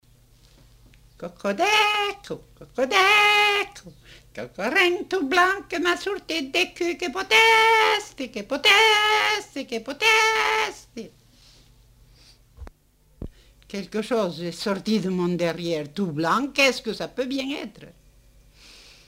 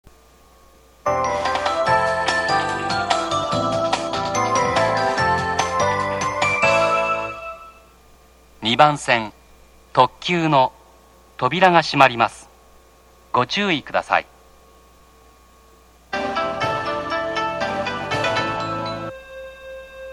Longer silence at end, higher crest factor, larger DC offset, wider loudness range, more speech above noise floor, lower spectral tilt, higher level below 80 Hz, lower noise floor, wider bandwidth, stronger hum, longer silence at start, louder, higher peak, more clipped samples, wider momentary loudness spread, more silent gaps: first, 1.2 s vs 0 s; about the same, 20 dB vs 22 dB; neither; first, 11 LU vs 6 LU; about the same, 36 dB vs 33 dB; about the same, -3 dB/octave vs -4 dB/octave; about the same, -54 dBFS vs -50 dBFS; first, -59 dBFS vs -51 dBFS; first, 16 kHz vs 14.5 kHz; neither; first, 1.2 s vs 1.05 s; about the same, -21 LUFS vs -20 LUFS; second, -4 dBFS vs 0 dBFS; neither; first, 22 LU vs 13 LU; neither